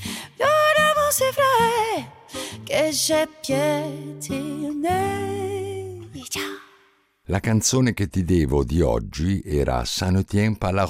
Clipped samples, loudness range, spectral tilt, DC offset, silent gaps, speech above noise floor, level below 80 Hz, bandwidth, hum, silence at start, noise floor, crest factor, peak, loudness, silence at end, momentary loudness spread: under 0.1%; 7 LU; -4.5 dB/octave; under 0.1%; none; 37 dB; -38 dBFS; 16 kHz; none; 0 s; -59 dBFS; 14 dB; -8 dBFS; -22 LUFS; 0 s; 14 LU